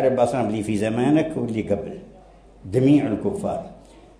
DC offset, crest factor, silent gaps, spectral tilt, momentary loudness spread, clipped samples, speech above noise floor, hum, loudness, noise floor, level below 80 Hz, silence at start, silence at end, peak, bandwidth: under 0.1%; 16 dB; none; -7.5 dB/octave; 14 LU; under 0.1%; 27 dB; none; -22 LUFS; -48 dBFS; -50 dBFS; 0 s; 0.45 s; -6 dBFS; 11 kHz